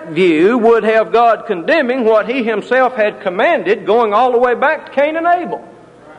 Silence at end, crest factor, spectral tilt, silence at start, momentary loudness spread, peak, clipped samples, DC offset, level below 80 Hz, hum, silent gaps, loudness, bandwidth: 0.05 s; 12 dB; -6.5 dB/octave; 0 s; 6 LU; 0 dBFS; under 0.1%; under 0.1%; -58 dBFS; none; none; -13 LUFS; 9.6 kHz